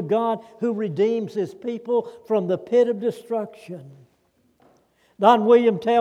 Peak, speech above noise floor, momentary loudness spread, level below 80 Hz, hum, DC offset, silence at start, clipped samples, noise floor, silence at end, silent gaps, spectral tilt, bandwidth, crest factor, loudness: -2 dBFS; 43 dB; 13 LU; -76 dBFS; none; under 0.1%; 0 s; under 0.1%; -64 dBFS; 0 s; none; -7 dB/octave; 10 kHz; 20 dB; -21 LUFS